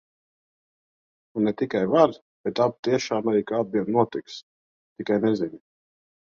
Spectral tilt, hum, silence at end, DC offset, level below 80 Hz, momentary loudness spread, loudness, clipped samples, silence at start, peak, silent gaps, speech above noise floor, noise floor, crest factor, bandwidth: -6 dB/octave; none; 0.65 s; under 0.1%; -66 dBFS; 14 LU; -24 LUFS; under 0.1%; 1.35 s; -4 dBFS; 2.22-2.44 s, 2.79-2.83 s, 4.43-4.96 s; over 67 dB; under -90 dBFS; 20 dB; 7.4 kHz